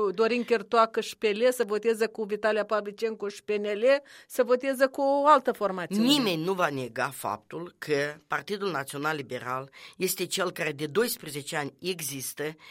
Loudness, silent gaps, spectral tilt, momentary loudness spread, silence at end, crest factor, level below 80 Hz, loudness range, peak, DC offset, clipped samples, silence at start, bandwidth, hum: -28 LUFS; none; -4 dB/octave; 10 LU; 0 s; 20 dB; -76 dBFS; 6 LU; -6 dBFS; under 0.1%; under 0.1%; 0 s; 16 kHz; none